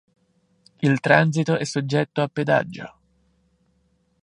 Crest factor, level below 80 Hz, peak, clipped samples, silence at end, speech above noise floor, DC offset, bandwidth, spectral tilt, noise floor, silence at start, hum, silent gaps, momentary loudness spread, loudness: 22 dB; -66 dBFS; -2 dBFS; under 0.1%; 1.35 s; 45 dB; under 0.1%; 10.5 kHz; -6 dB/octave; -66 dBFS; 0.8 s; none; none; 14 LU; -21 LUFS